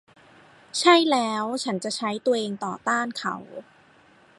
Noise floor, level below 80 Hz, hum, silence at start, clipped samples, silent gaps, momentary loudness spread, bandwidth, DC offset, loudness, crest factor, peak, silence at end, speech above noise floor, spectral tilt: -56 dBFS; -74 dBFS; none; 0.75 s; under 0.1%; none; 14 LU; 11.5 kHz; under 0.1%; -24 LUFS; 20 dB; -4 dBFS; 0.75 s; 32 dB; -3.5 dB/octave